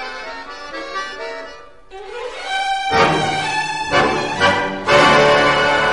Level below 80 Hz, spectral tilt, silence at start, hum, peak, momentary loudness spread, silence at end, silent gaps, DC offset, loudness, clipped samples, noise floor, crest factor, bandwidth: -44 dBFS; -3.5 dB/octave; 0 s; none; -2 dBFS; 18 LU; 0 s; none; 0.7%; -15 LUFS; under 0.1%; -38 dBFS; 16 dB; 11.5 kHz